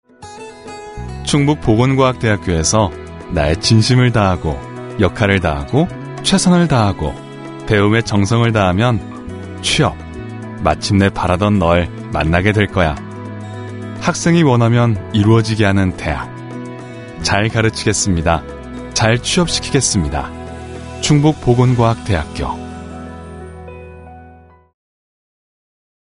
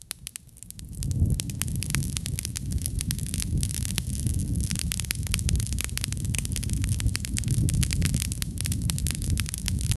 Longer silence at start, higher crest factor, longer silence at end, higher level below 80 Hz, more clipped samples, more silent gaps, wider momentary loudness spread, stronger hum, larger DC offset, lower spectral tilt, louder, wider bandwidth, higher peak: about the same, 0.2 s vs 0.15 s; second, 16 dB vs 28 dB; first, 1.7 s vs 0.05 s; about the same, -32 dBFS vs -34 dBFS; neither; neither; first, 18 LU vs 5 LU; neither; neither; about the same, -5 dB/octave vs -4 dB/octave; first, -15 LUFS vs -28 LUFS; second, 11 kHz vs 14 kHz; about the same, 0 dBFS vs 0 dBFS